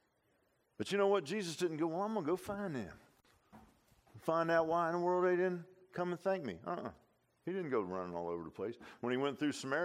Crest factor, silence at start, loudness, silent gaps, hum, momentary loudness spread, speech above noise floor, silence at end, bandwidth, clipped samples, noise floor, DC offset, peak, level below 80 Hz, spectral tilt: 20 dB; 0.8 s; -37 LUFS; none; none; 12 LU; 40 dB; 0 s; 15 kHz; under 0.1%; -77 dBFS; under 0.1%; -18 dBFS; -74 dBFS; -5.5 dB/octave